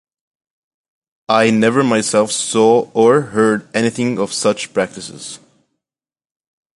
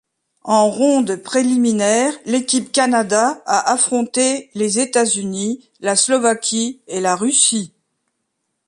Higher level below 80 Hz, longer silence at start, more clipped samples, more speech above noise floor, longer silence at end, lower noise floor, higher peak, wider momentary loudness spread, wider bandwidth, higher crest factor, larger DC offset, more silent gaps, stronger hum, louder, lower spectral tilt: first, -60 dBFS vs -66 dBFS; first, 1.3 s vs 0.45 s; neither; first, over 75 dB vs 56 dB; first, 1.4 s vs 1 s; first, under -90 dBFS vs -73 dBFS; about the same, 0 dBFS vs -2 dBFS; first, 15 LU vs 8 LU; about the same, 11.5 kHz vs 11.5 kHz; about the same, 16 dB vs 16 dB; neither; neither; neither; about the same, -15 LUFS vs -16 LUFS; first, -4.5 dB/octave vs -2.5 dB/octave